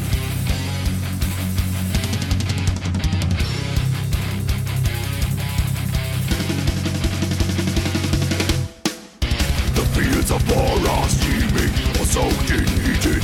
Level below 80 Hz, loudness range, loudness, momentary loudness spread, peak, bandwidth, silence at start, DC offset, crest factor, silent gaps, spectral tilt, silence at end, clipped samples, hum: -26 dBFS; 3 LU; -21 LUFS; 5 LU; -8 dBFS; 17.5 kHz; 0 s; under 0.1%; 12 dB; none; -5 dB/octave; 0 s; under 0.1%; none